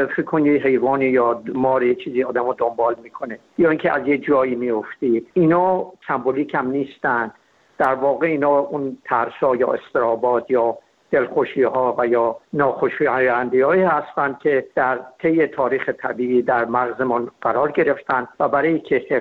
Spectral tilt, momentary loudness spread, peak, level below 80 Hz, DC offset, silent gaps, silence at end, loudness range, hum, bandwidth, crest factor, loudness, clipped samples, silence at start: -9 dB/octave; 6 LU; -2 dBFS; -60 dBFS; under 0.1%; none; 0 s; 2 LU; none; 4.7 kHz; 16 dB; -19 LUFS; under 0.1%; 0 s